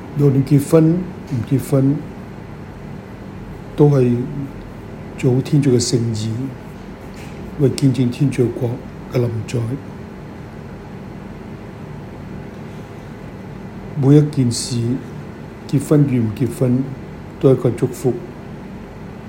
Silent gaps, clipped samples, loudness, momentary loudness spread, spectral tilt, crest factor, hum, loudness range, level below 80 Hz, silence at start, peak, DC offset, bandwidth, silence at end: none; under 0.1%; -17 LUFS; 20 LU; -7 dB/octave; 18 dB; none; 11 LU; -44 dBFS; 0 s; 0 dBFS; under 0.1%; 16.5 kHz; 0 s